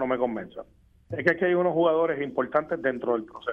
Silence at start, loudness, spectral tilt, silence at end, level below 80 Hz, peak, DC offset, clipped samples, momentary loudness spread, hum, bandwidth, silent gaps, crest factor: 0 s; -26 LUFS; -8 dB/octave; 0 s; -62 dBFS; -6 dBFS; under 0.1%; under 0.1%; 14 LU; none; 6 kHz; none; 20 dB